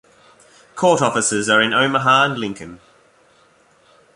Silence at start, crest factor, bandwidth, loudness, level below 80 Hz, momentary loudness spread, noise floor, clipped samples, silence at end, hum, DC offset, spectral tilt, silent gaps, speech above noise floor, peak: 0.75 s; 18 dB; 11.5 kHz; -16 LUFS; -60 dBFS; 19 LU; -54 dBFS; under 0.1%; 1.4 s; none; under 0.1%; -3 dB/octave; none; 38 dB; -2 dBFS